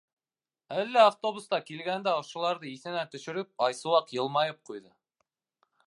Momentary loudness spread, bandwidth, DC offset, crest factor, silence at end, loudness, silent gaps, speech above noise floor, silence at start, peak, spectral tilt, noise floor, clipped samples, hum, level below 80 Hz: 14 LU; 11.5 kHz; under 0.1%; 22 dB; 1.05 s; -29 LUFS; none; over 61 dB; 0.7 s; -8 dBFS; -4 dB/octave; under -90 dBFS; under 0.1%; none; -86 dBFS